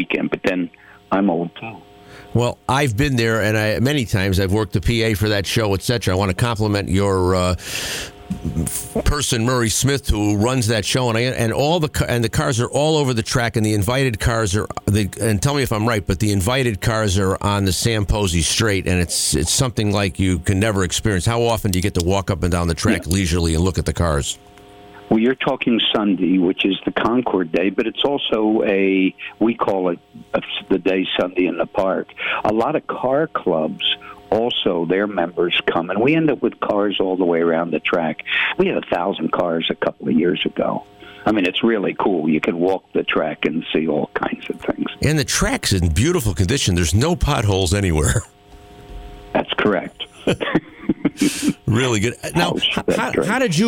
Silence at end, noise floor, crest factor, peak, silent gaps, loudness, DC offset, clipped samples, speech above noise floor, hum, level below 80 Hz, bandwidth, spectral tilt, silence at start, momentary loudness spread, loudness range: 0 s; -42 dBFS; 14 dB; -4 dBFS; none; -19 LUFS; under 0.1%; under 0.1%; 24 dB; none; -34 dBFS; 17 kHz; -5 dB/octave; 0 s; 5 LU; 2 LU